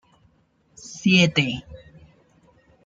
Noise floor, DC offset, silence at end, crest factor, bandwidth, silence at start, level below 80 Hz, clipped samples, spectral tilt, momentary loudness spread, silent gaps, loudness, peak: -63 dBFS; under 0.1%; 1.1 s; 20 dB; 7.8 kHz; 0.8 s; -56 dBFS; under 0.1%; -5 dB/octave; 23 LU; none; -20 LUFS; -6 dBFS